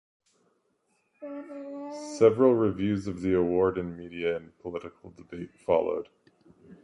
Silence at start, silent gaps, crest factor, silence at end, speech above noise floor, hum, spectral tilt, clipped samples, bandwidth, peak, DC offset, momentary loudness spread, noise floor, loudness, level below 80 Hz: 1.2 s; none; 20 dB; 0.1 s; 45 dB; none; -7 dB/octave; under 0.1%; 11 kHz; -8 dBFS; under 0.1%; 19 LU; -73 dBFS; -27 LUFS; -56 dBFS